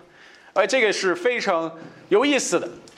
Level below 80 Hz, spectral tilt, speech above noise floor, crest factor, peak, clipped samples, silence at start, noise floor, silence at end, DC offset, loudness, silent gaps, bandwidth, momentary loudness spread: -72 dBFS; -2.5 dB/octave; 28 dB; 18 dB; -6 dBFS; under 0.1%; 0.55 s; -49 dBFS; 0.2 s; under 0.1%; -21 LUFS; none; 13 kHz; 7 LU